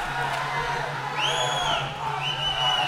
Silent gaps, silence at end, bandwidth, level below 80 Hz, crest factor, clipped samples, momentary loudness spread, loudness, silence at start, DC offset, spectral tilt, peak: none; 0 s; 16.5 kHz; -48 dBFS; 14 dB; under 0.1%; 5 LU; -25 LUFS; 0 s; under 0.1%; -2.5 dB/octave; -12 dBFS